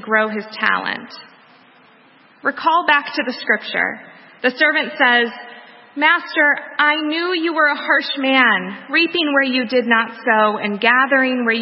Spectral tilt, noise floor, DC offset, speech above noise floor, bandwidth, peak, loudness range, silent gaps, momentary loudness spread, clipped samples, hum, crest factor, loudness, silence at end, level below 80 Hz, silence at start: -7.5 dB/octave; -50 dBFS; under 0.1%; 32 dB; 5.8 kHz; 0 dBFS; 5 LU; none; 9 LU; under 0.1%; none; 18 dB; -16 LUFS; 0 s; -74 dBFS; 0 s